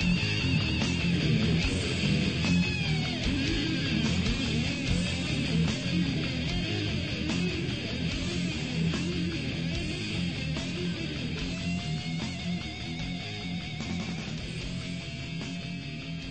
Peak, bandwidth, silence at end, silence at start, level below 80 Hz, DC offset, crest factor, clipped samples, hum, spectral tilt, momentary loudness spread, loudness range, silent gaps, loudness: -14 dBFS; 8.8 kHz; 0 s; 0 s; -42 dBFS; 0.2%; 16 dB; under 0.1%; none; -5 dB/octave; 9 LU; 7 LU; none; -30 LUFS